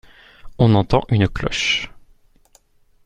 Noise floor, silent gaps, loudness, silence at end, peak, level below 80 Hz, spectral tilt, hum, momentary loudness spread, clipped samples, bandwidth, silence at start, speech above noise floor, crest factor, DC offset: -55 dBFS; none; -18 LUFS; 1.2 s; -2 dBFS; -36 dBFS; -5.5 dB/octave; none; 6 LU; under 0.1%; 9.2 kHz; 0.45 s; 38 dB; 18 dB; under 0.1%